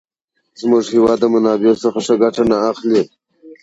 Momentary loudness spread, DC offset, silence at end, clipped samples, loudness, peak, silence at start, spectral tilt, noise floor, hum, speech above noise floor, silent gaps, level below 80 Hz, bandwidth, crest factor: 4 LU; under 0.1%; 0.1 s; under 0.1%; -15 LUFS; -2 dBFS; 0.6 s; -6 dB/octave; -70 dBFS; none; 56 dB; none; -52 dBFS; 8 kHz; 14 dB